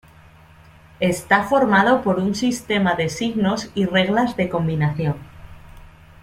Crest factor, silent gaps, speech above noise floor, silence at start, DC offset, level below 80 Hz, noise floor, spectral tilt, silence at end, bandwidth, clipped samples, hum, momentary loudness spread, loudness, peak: 20 dB; none; 28 dB; 1 s; under 0.1%; -48 dBFS; -47 dBFS; -5.5 dB/octave; 0.35 s; 15.5 kHz; under 0.1%; none; 7 LU; -19 LUFS; -2 dBFS